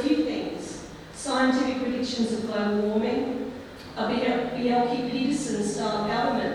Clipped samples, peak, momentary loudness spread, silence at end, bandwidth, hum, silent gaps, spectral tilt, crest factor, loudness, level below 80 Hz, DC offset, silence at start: under 0.1%; -10 dBFS; 12 LU; 0 s; 12.5 kHz; none; none; -4.5 dB/octave; 16 dB; -26 LUFS; -54 dBFS; under 0.1%; 0 s